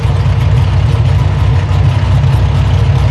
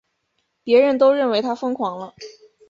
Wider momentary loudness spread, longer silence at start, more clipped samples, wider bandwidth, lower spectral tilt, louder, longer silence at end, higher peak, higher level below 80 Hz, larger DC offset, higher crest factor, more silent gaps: second, 1 LU vs 21 LU; second, 0 s vs 0.65 s; neither; first, 12 kHz vs 7.4 kHz; first, -7.5 dB/octave vs -5.5 dB/octave; first, -11 LUFS vs -18 LUFS; second, 0 s vs 0.4 s; first, 0 dBFS vs -4 dBFS; first, -16 dBFS vs -66 dBFS; neither; second, 8 dB vs 16 dB; neither